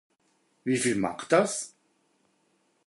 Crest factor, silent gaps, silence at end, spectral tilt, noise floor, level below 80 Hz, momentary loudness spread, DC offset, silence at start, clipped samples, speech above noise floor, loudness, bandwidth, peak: 22 dB; none; 1.2 s; -4 dB/octave; -70 dBFS; -68 dBFS; 12 LU; under 0.1%; 0.65 s; under 0.1%; 44 dB; -27 LUFS; 11.5 kHz; -8 dBFS